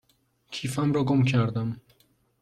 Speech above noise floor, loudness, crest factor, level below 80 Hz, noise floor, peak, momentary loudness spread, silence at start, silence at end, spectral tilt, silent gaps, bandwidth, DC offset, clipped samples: 43 dB; -26 LUFS; 16 dB; -60 dBFS; -67 dBFS; -12 dBFS; 14 LU; 0.5 s; 0.65 s; -7 dB/octave; none; 13 kHz; under 0.1%; under 0.1%